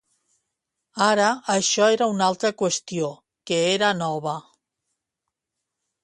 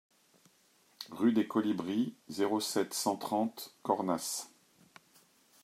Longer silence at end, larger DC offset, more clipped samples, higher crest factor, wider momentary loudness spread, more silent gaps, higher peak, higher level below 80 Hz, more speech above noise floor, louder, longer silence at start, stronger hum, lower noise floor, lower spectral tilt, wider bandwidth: first, 1.65 s vs 1.15 s; neither; neither; about the same, 20 dB vs 22 dB; about the same, 11 LU vs 10 LU; neither; first, -4 dBFS vs -14 dBFS; first, -70 dBFS vs -84 dBFS; first, 62 dB vs 35 dB; first, -22 LUFS vs -33 LUFS; about the same, 0.95 s vs 1 s; neither; first, -84 dBFS vs -68 dBFS; about the same, -3 dB/octave vs -4 dB/octave; second, 11.5 kHz vs 16 kHz